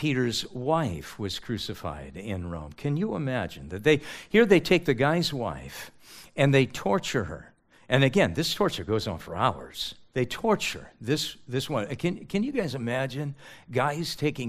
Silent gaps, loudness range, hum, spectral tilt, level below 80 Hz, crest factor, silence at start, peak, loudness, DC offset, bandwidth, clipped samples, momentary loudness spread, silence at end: none; 6 LU; none; -5.5 dB/octave; -54 dBFS; 22 dB; 0 s; -6 dBFS; -27 LUFS; under 0.1%; 15.5 kHz; under 0.1%; 13 LU; 0 s